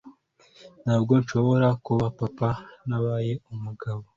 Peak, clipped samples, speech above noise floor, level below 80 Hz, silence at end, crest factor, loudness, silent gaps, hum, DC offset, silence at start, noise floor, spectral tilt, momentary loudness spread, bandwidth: -6 dBFS; under 0.1%; 33 dB; -56 dBFS; 0.15 s; 18 dB; -25 LUFS; none; none; under 0.1%; 0.05 s; -57 dBFS; -8.5 dB/octave; 12 LU; 7.4 kHz